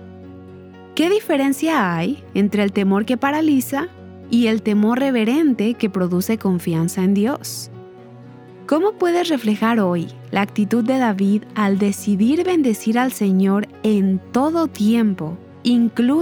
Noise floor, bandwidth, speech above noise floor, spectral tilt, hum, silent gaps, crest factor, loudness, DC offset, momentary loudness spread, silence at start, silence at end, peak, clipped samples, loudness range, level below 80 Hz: -40 dBFS; 20 kHz; 22 dB; -6 dB/octave; none; none; 16 dB; -18 LUFS; under 0.1%; 7 LU; 0 s; 0 s; -2 dBFS; under 0.1%; 3 LU; -64 dBFS